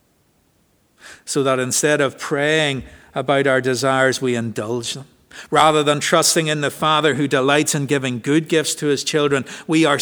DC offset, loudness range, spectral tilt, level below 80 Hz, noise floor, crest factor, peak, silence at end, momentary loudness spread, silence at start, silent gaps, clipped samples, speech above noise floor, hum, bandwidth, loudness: under 0.1%; 3 LU; -3.5 dB/octave; -56 dBFS; -60 dBFS; 18 dB; 0 dBFS; 0 s; 9 LU; 1.05 s; none; under 0.1%; 42 dB; none; over 20 kHz; -18 LUFS